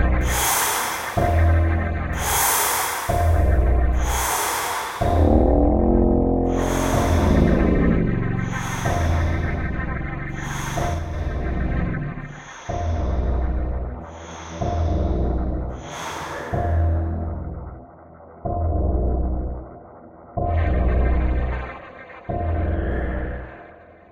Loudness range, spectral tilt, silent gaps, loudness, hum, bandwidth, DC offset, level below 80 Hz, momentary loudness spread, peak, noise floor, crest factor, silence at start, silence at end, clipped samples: 8 LU; -5.5 dB/octave; none; -22 LUFS; none; 16.5 kHz; under 0.1%; -26 dBFS; 15 LU; -4 dBFS; -45 dBFS; 18 dB; 0 s; 0.3 s; under 0.1%